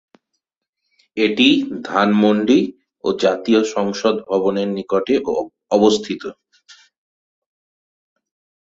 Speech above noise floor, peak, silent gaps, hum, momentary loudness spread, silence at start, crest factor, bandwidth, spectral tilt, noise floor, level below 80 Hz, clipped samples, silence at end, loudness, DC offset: 62 dB; -2 dBFS; none; none; 11 LU; 1.15 s; 18 dB; 8 kHz; -5 dB/octave; -79 dBFS; -60 dBFS; under 0.1%; 2.3 s; -18 LUFS; under 0.1%